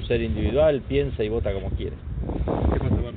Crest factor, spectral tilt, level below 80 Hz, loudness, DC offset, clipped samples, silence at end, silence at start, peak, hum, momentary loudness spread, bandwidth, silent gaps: 12 dB; -7 dB/octave; -30 dBFS; -25 LUFS; under 0.1%; under 0.1%; 0 s; 0 s; -10 dBFS; none; 10 LU; 4.5 kHz; none